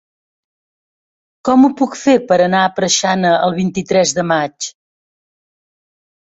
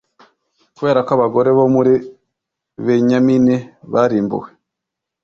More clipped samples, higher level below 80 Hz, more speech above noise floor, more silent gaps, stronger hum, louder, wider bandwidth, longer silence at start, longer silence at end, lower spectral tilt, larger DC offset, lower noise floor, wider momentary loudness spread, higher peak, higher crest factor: neither; about the same, -56 dBFS vs -56 dBFS; first, over 76 dB vs 67 dB; neither; neither; about the same, -14 LUFS vs -15 LUFS; first, 8 kHz vs 7 kHz; first, 1.45 s vs 0.8 s; first, 1.6 s vs 0.8 s; second, -4 dB/octave vs -8 dB/octave; neither; first, under -90 dBFS vs -81 dBFS; about the same, 9 LU vs 9 LU; about the same, -2 dBFS vs -2 dBFS; about the same, 14 dB vs 14 dB